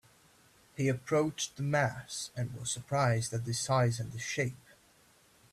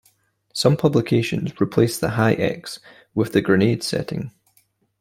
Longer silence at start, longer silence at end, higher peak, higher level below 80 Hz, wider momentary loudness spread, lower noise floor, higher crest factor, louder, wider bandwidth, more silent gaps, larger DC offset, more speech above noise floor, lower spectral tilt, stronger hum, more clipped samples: first, 0.75 s vs 0.55 s; first, 0.95 s vs 0.7 s; second, -16 dBFS vs -2 dBFS; second, -66 dBFS vs -54 dBFS; second, 8 LU vs 14 LU; about the same, -64 dBFS vs -63 dBFS; about the same, 18 dB vs 18 dB; second, -33 LUFS vs -20 LUFS; second, 14 kHz vs 16.5 kHz; neither; neither; second, 32 dB vs 43 dB; second, -4.5 dB/octave vs -6 dB/octave; neither; neither